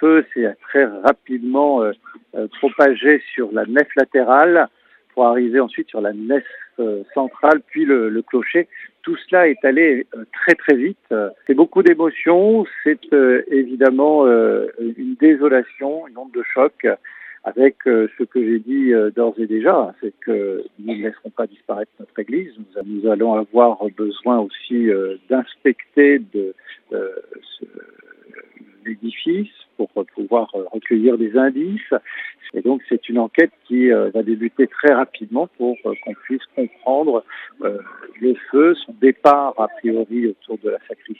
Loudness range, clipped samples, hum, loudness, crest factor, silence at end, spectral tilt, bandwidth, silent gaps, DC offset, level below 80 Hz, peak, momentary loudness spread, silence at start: 7 LU; under 0.1%; none; -17 LUFS; 18 dB; 0.05 s; -7.5 dB/octave; 5.8 kHz; none; under 0.1%; -72 dBFS; 0 dBFS; 14 LU; 0 s